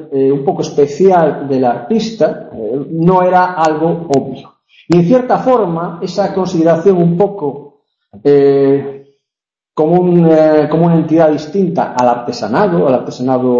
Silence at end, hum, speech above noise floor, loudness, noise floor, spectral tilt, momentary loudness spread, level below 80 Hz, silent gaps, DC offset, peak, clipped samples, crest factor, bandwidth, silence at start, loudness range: 0 s; none; 74 dB; -12 LUFS; -85 dBFS; -8 dB/octave; 10 LU; -52 dBFS; none; under 0.1%; 0 dBFS; under 0.1%; 12 dB; 7.6 kHz; 0 s; 3 LU